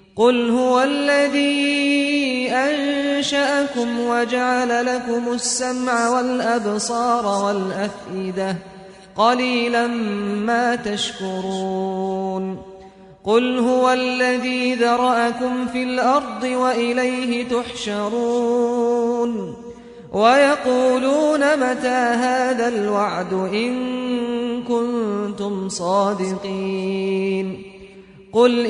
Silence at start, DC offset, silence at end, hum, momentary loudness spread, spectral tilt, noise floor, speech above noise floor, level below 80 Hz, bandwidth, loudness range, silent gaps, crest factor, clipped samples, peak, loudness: 0.15 s; under 0.1%; 0 s; none; 8 LU; -4 dB/octave; -43 dBFS; 24 dB; -58 dBFS; 11 kHz; 4 LU; none; 18 dB; under 0.1%; -2 dBFS; -20 LUFS